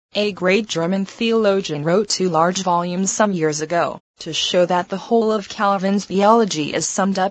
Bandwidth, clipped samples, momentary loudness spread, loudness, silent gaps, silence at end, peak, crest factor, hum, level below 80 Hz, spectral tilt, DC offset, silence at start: 9.2 kHz; under 0.1%; 5 LU; -18 LUFS; 4.00-4.14 s; 0 s; 0 dBFS; 18 dB; none; -60 dBFS; -4 dB/octave; under 0.1%; 0.15 s